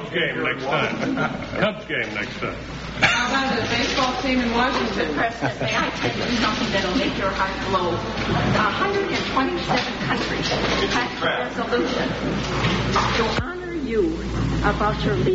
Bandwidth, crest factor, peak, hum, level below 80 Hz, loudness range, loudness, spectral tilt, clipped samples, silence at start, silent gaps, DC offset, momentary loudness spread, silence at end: 8 kHz; 20 dB; -2 dBFS; none; -38 dBFS; 1 LU; -22 LUFS; -3 dB/octave; under 0.1%; 0 s; none; under 0.1%; 5 LU; 0 s